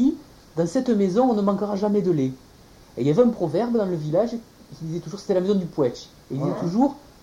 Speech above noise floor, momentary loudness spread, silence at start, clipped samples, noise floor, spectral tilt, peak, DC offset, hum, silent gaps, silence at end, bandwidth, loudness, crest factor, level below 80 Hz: 27 dB; 14 LU; 0 s; under 0.1%; -49 dBFS; -8 dB/octave; -6 dBFS; under 0.1%; none; none; 0.25 s; 15.5 kHz; -23 LUFS; 16 dB; -56 dBFS